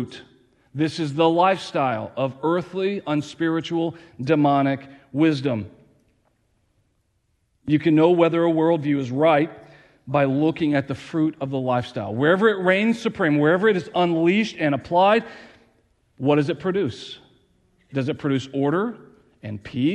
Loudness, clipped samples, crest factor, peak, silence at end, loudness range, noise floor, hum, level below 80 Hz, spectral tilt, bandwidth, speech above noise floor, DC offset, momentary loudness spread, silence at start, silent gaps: -21 LUFS; under 0.1%; 18 dB; -4 dBFS; 0 s; 5 LU; -69 dBFS; none; -62 dBFS; -7 dB/octave; 10 kHz; 48 dB; under 0.1%; 12 LU; 0 s; none